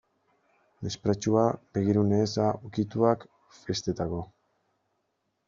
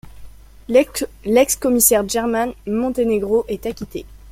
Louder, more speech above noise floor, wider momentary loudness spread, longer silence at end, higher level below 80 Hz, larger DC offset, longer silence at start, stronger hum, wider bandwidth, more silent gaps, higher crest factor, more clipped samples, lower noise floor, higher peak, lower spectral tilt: second, -28 LUFS vs -18 LUFS; first, 51 dB vs 20 dB; about the same, 13 LU vs 13 LU; first, 1.2 s vs 0 s; second, -60 dBFS vs -42 dBFS; neither; first, 0.8 s vs 0.05 s; neither; second, 7.4 kHz vs 16.5 kHz; neither; about the same, 20 dB vs 18 dB; neither; first, -77 dBFS vs -38 dBFS; second, -8 dBFS vs 0 dBFS; first, -7 dB/octave vs -3.5 dB/octave